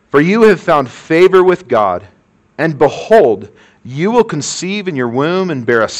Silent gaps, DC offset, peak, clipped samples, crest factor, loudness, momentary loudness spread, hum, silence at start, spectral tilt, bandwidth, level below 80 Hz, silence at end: none; under 0.1%; 0 dBFS; under 0.1%; 12 dB; -12 LUFS; 10 LU; none; 0.15 s; -5.5 dB/octave; 10.5 kHz; -50 dBFS; 0 s